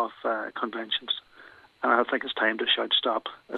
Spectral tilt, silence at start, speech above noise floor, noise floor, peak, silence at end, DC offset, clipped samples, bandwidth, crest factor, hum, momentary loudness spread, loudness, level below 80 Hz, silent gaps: -4.5 dB/octave; 0 s; 25 dB; -52 dBFS; -6 dBFS; 0 s; under 0.1%; under 0.1%; 5.2 kHz; 22 dB; none; 9 LU; -26 LUFS; -76 dBFS; none